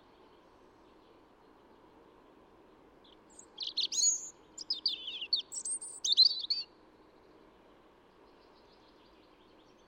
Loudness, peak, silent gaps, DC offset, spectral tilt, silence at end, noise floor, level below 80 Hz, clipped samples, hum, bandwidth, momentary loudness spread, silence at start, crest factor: -30 LUFS; -14 dBFS; none; under 0.1%; 2.5 dB/octave; 3.25 s; -62 dBFS; -76 dBFS; under 0.1%; none; 16 kHz; 20 LU; 3.4 s; 24 dB